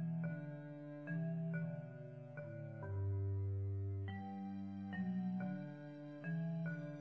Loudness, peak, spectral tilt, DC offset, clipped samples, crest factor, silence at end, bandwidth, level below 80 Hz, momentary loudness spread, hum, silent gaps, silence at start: -45 LUFS; -32 dBFS; -9 dB/octave; under 0.1%; under 0.1%; 10 dB; 0 s; 5 kHz; -60 dBFS; 10 LU; none; none; 0 s